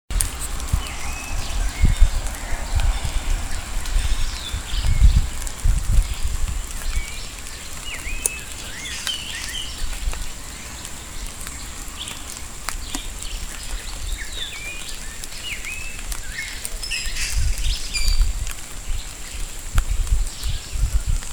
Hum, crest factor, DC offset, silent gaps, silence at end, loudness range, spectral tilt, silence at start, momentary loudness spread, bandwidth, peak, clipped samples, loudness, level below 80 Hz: none; 22 dB; 0.6%; none; 0 s; 7 LU; -2.5 dB/octave; 0.1 s; 9 LU; over 20 kHz; 0 dBFS; under 0.1%; -27 LUFS; -24 dBFS